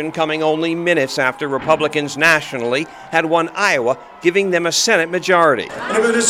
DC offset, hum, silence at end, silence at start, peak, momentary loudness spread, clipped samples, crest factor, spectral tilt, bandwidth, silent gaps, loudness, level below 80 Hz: under 0.1%; none; 0 s; 0 s; 0 dBFS; 7 LU; under 0.1%; 16 dB; -3 dB/octave; 16.5 kHz; none; -16 LUFS; -58 dBFS